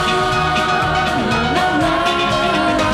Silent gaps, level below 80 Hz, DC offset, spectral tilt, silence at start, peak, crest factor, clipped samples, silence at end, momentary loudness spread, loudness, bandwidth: none; -36 dBFS; under 0.1%; -4.5 dB/octave; 0 s; -4 dBFS; 12 dB; under 0.1%; 0 s; 1 LU; -16 LUFS; 15.5 kHz